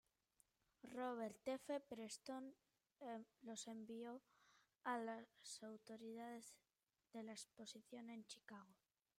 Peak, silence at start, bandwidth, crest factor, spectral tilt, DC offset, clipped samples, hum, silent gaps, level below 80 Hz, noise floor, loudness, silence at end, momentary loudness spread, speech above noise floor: -34 dBFS; 0.85 s; 16 kHz; 22 dB; -3.5 dB/octave; under 0.1%; under 0.1%; none; none; under -90 dBFS; -83 dBFS; -54 LUFS; 0.45 s; 11 LU; 30 dB